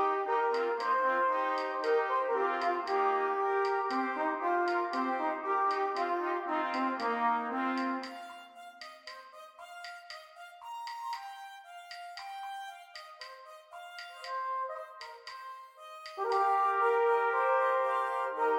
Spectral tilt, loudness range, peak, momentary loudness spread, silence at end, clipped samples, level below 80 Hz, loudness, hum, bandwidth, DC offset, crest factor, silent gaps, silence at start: -3 dB/octave; 14 LU; -18 dBFS; 19 LU; 0 s; under 0.1%; -86 dBFS; -31 LUFS; none; 17 kHz; under 0.1%; 16 dB; none; 0 s